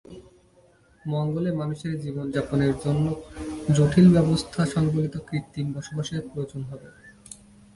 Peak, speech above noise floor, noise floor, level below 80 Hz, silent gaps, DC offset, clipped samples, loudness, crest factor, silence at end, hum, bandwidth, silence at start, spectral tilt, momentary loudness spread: -6 dBFS; 34 dB; -58 dBFS; -48 dBFS; none; under 0.1%; under 0.1%; -24 LUFS; 18 dB; 0.4 s; none; 11.5 kHz; 0.1 s; -7 dB/octave; 20 LU